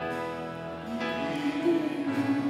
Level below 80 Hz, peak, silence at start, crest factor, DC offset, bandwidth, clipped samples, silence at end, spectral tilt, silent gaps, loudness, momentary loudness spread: -66 dBFS; -14 dBFS; 0 s; 14 dB; under 0.1%; 14 kHz; under 0.1%; 0 s; -6 dB/octave; none; -31 LUFS; 9 LU